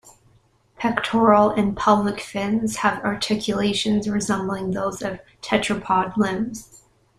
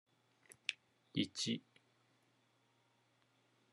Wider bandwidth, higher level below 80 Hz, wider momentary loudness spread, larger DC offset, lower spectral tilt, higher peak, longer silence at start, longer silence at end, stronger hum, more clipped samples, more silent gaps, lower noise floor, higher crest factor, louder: first, 13.5 kHz vs 11 kHz; first, -52 dBFS vs under -90 dBFS; first, 10 LU vs 6 LU; neither; first, -5 dB/octave vs -3.5 dB/octave; first, -2 dBFS vs -18 dBFS; second, 0.05 s vs 0.7 s; second, 0.55 s vs 2.15 s; neither; neither; neither; second, -59 dBFS vs -77 dBFS; second, 20 dB vs 30 dB; first, -21 LUFS vs -42 LUFS